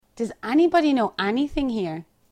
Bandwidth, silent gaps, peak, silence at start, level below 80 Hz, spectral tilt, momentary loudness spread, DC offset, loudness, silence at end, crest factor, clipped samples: 11 kHz; none; -6 dBFS; 0.15 s; -46 dBFS; -6 dB/octave; 13 LU; under 0.1%; -23 LUFS; 0.3 s; 16 dB; under 0.1%